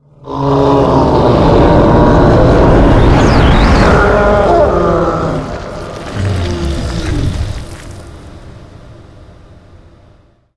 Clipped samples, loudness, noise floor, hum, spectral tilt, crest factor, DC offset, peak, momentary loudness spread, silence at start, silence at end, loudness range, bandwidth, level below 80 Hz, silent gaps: 0.4%; -10 LUFS; -46 dBFS; none; -7.5 dB/octave; 10 dB; under 0.1%; 0 dBFS; 16 LU; 0.25 s; 1.65 s; 14 LU; 11 kHz; -18 dBFS; none